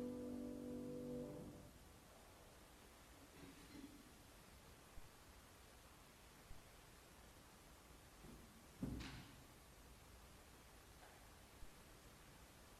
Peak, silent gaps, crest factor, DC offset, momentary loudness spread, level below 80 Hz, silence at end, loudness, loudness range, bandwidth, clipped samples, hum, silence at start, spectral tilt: -36 dBFS; none; 22 dB; under 0.1%; 13 LU; -68 dBFS; 0 s; -58 LUFS; 8 LU; 14.5 kHz; under 0.1%; none; 0 s; -5 dB/octave